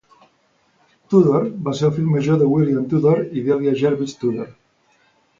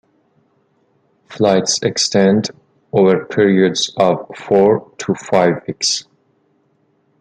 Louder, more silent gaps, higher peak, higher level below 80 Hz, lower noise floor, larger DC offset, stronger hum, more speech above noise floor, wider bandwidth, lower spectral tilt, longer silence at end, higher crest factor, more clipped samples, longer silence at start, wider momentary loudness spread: second, -18 LUFS vs -15 LUFS; neither; about the same, -2 dBFS vs 0 dBFS; about the same, -56 dBFS vs -58 dBFS; about the same, -61 dBFS vs -60 dBFS; neither; neither; about the same, 44 dB vs 46 dB; second, 7.6 kHz vs 9.4 kHz; first, -8.5 dB/octave vs -4.5 dB/octave; second, 0.9 s vs 1.2 s; about the same, 18 dB vs 16 dB; neither; second, 1.1 s vs 1.3 s; about the same, 8 LU vs 8 LU